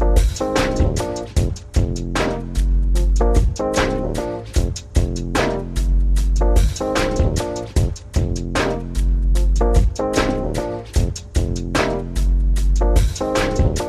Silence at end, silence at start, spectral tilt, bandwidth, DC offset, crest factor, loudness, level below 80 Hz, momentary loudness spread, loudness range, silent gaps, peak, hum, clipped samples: 0 s; 0 s; -5.5 dB/octave; 13 kHz; under 0.1%; 16 dB; -20 LUFS; -20 dBFS; 5 LU; 1 LU; none; -2 dBFS; none; under 0.1%